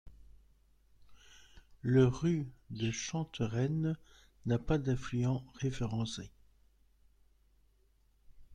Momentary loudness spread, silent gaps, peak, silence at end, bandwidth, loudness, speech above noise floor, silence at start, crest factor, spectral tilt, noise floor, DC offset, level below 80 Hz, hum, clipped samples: 14 LU; none; -14 dBFS; 0 s; 9.8 kHz; -35 LUFS; 36 dB; 0.05 s; 22 dB; -6.5 dB/octave; -69 dBFS; under 0.1%; -54 dBFS; none; under 0.1%